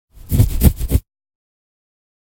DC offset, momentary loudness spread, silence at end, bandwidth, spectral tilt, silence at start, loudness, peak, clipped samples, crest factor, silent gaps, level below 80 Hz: under 0.1%; 7 LU; 1.3 s; 17 kHz; -6.5 dB/octave; 0.3 s; -18 LUFS; 0 dBFS; under 0.1%; 18 dB; none; -22 dBFS